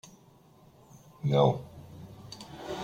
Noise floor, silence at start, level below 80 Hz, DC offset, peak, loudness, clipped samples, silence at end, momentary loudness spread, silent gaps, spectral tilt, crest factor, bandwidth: -58 dBFS; 1.25 s; -62 dBFS; under 0.1%; -10 dBFS; -28 LUFS; under 0.1%; 0 s; 23 LU; none; -7 dB/octave; 22 dB; 15 kHz